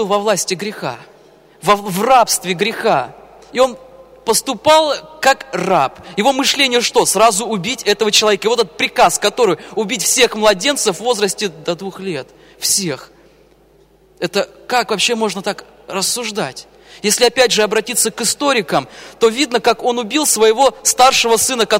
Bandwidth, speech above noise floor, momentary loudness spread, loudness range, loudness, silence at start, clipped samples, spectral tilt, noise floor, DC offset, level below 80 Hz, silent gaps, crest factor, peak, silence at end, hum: 16.5 kHz; 35 dB; 12 LU; 6 LU; -15 LUFS; 0 s; under 0.1%; -2 dB/octave; -50 dBFS; under 0.1%; -52 dBFS; none; 16 dB; 0 dBFS; 0 s; none